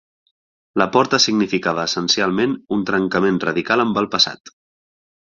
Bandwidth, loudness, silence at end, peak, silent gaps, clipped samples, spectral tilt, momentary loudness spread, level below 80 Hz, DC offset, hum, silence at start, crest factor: 7.6 kHz; -18 LUFS; 0.9 s; 0 dBFS; 4.40-4.44 s; under 0.1%; -3.5 dB/octave; 6 LU; -56 dBFS; under 0.1%; none; 0.75 s; 20 dB